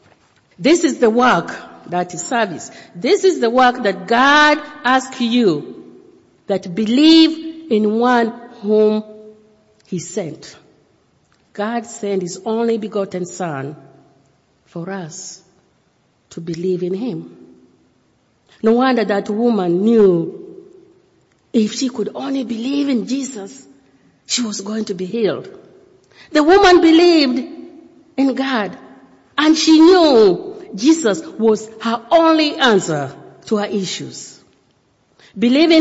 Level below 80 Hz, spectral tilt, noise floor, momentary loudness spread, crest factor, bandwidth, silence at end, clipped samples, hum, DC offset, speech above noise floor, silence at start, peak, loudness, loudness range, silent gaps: -54 dBFS; -4.5 dB/octave; -60 dBFS; 19 LU; 16 dB; 8 kHz; 0 s; under 0.1%; none; under 0.1%; 45 dB; 0.6 s; -2 dBFS; -15 LUFS; 13 LU; none